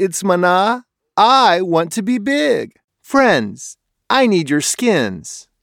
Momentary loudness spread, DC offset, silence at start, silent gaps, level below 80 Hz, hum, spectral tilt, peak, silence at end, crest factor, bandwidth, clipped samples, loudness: 15 LU; under 0.1%; 0 s; 2.84-2.88 s; -60 dBFS; none; -4 dB/octave; 0 dBFS; 0.2 s; 14 dB; 17.5 kHz; under 0.1%; -15 LUFS